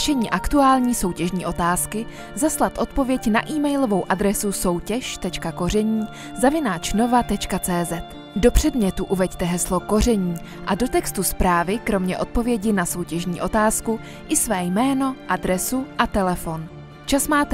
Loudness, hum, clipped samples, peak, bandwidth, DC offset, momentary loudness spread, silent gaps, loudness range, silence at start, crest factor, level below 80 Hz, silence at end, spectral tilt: -21 LUFS; none; under 0.1%; 0 dBFS; 16 kHz; under 0.1%; 8 LU; none; 1 LU; 0 s; 20 dB; -34 dBFS; 0 s; -4.5 dB/octave